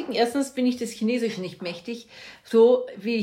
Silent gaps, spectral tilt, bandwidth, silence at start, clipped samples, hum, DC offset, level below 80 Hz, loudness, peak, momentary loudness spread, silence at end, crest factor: none; -5 dB/octave; 15 kHz; 0 s; under 0.1%; none; under 0.1%; -72 dBFS; -24 LUFS; -8 dBFS; 18 LU; 0 s; 16 dB